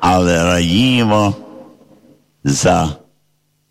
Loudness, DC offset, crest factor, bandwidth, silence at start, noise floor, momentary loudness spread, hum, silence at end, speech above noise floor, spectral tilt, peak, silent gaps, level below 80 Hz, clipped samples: -14 LUFS; under 0.1%; 12 dB; 16 kHz; 0 s; -63 dBFS; 11 LU; none; 0.75 s; 49 dB; -5 dB/octave; -4 dBFS; none; -38 dBFS; under 0.1%